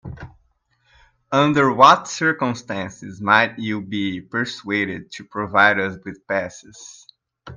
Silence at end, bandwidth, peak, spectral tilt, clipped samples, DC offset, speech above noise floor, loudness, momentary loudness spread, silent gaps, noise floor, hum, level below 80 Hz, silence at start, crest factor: 0 s; 9.8 kHz; 0 dBFS; -4.5 dB/octave; under 0.1%; under 0.1%; 44 dB; -19 LUFS; 23 LU; none; -64 dBFS; none; -56 dBFS; 0.05 s; 20 dB